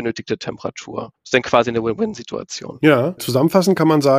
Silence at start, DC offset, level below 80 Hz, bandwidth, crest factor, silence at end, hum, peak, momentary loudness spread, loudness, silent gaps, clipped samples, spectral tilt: 0 s; under 0.1%; -56 dBFS; 15.5 kHz; 18 dB; 0 s; none; 0 dBFS; 15 LU; -18 LUFS; none; under 0.1%; -5.5 dB/octave